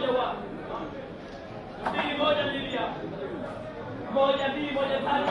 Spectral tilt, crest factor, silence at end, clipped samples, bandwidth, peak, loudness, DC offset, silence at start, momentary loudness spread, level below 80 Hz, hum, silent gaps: -6 dB/octave; 18 dB; 0 s; under 0.1%; 10.5 kHz; -12 dBFS; -29 LUFS; under 0.1%; 0 s; 15 LU; -54 dBFS; none; none